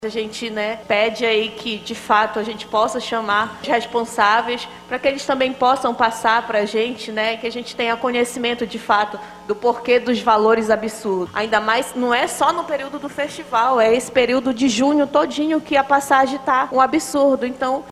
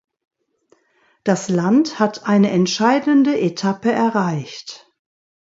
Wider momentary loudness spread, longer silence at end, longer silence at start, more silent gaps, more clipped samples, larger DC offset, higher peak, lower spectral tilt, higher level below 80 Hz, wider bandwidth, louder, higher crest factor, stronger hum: about the same, 9 LU vs 11 LU; second, 0 s vs 0.65 s; second, 0 s vs 1.25 s; neither; neither; neither; about the same, -2 dBFS vs -2 dBFS; second, -3.5 dB/octave vs -5.5 dB/octave; first, -56 dBFS vs -66 dBFS; first, 14.5 kHz vs 8 kHz; about the same, -19 LUFS vs -17 LUFS; about the same, 18 dB vs 18 dB; neither